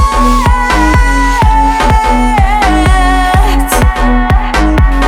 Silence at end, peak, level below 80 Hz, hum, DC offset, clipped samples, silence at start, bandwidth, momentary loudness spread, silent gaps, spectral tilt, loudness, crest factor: 0 s; 0 dBFS; -10 dBFS; none; under 0.1%; under 0.1%; 0 s; 15 kHz; 2 LU; none; -5.5 dB/octave; -9 LUFS; 8 dB